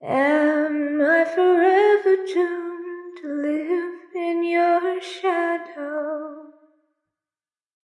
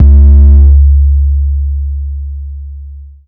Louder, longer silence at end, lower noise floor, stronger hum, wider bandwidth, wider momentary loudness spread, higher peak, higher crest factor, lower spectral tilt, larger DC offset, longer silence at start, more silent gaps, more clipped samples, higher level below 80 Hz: second, -21 LUFS vs -8 LUFS; first, 1.35 s vs 0.2 s; first, under -90 dBFS vs -27 dBFS; neither; first, 10.5 kHz vs 1 kHz; second, 15 LU vs 20 LU; second, -8 dBFS vs 0 dBFS; first, 14 dB vs 6 dB; second, -5 dB/octave vs -13.5 dB/octave; neither; about the same, 0 s vs 0 s; neither; second, under 0.1% vs 9%; second, -86 dBFS vs -6 dBFS